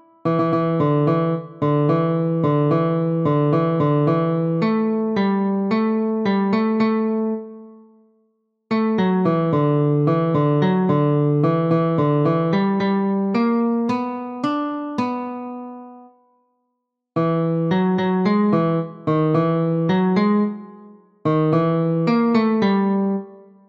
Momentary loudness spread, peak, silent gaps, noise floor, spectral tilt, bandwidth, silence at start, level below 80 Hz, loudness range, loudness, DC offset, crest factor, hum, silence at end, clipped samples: 6 LU; -6 dBFS; none; -76 dBFS; -9.5 dB/octave; 6.2 kHz; 0.25 s; -66 dBFS; 5 LU; -19 LUFS; under 0.1%; 12 dB; none; 0.3 s; under 0.1%